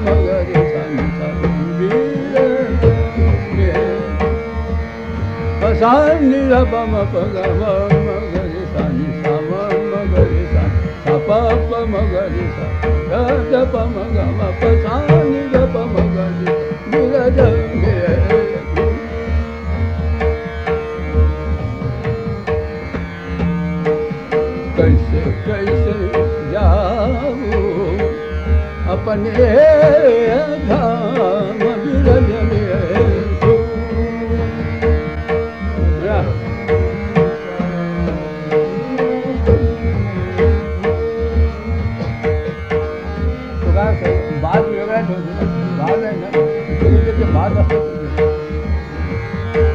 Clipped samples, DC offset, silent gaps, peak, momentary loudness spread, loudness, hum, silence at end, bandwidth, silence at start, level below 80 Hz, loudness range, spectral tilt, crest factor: under 0.1%; 0.3%; none; 0 dBFS; 8 LU; -16 LUFS; none; 0 s; 6.8 kHz; 0 s; -22 dBFS; 5 LU; -9 dB/octave; 14 dB